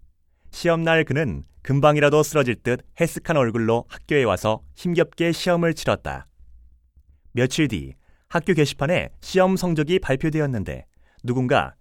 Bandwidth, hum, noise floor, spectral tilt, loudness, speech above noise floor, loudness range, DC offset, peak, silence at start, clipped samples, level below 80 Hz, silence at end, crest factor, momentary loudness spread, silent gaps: 17 kHz; none; -55 dBFS; -6 dB/octave; -22 LUFS; 34 dB; 4 LU; under 0.1%; -4 dBFS; 0.5 s; under 0.1%; -44 dBFS; 0.1 s; 18 dB; 10 LU; none